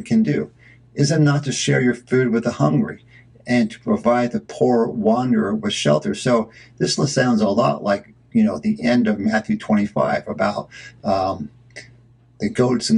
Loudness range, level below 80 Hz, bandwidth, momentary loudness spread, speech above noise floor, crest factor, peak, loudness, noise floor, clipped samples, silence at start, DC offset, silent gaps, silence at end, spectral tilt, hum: 2 LU; -54 dBFS; 11 kHz; 12 LU; 32 dB; 16 dB; -2 dBFS; -19 LUFS; -51 dBFS; under 0.1%; 0 s; under 0.1%; none; 0 s; -5.5 dB/octave; none